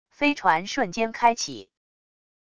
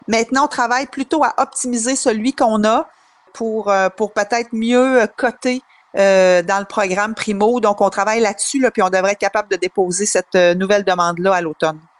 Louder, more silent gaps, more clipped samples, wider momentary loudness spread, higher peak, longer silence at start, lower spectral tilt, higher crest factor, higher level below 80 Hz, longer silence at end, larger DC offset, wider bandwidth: second, -24 LUFS vs -16 LUFS; neither; neither; first, 9 LU vs 6 LU; second, -6 dBFS vs -2 dBFS; about the same, 0.15 s vs 0.1 s; about the same, -3 dB/octave vs -3.5 dB/octave; first, 20 dB vs 14 dB; about the same, -60 dBFS vs -56 dBFS; first, 0.7 s vs 0.2 s; neither; about the same, 11 kHz vs 11.5 kHz